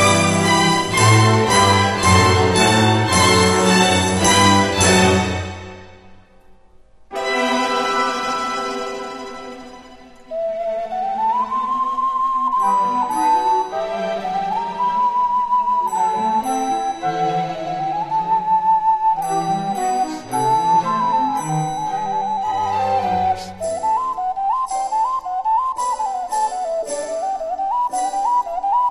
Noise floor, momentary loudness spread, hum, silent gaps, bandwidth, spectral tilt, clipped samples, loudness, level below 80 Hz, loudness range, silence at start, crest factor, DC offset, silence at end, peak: -47 dBFS; 10 LU; none; none; 13.5 kHz; -4 dB/octave; under 0.1%; -18 LUFS; -46 dBFS; 8 LU; 0 s; 18 dB; under 0.1%; 0 s; 0 dBFS